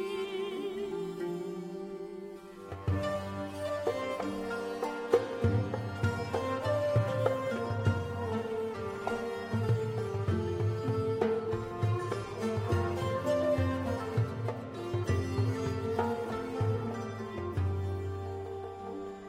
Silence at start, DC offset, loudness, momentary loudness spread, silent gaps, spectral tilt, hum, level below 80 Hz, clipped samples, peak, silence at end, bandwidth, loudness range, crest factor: 0 s; under 0.1%; -34 LUFS; 9 LU; none; -7.5 dB/octave; none; -56 dBFS; under 0.1%; -12 dBFS; 0 s; 15 kHz; 5 LU; 22 dB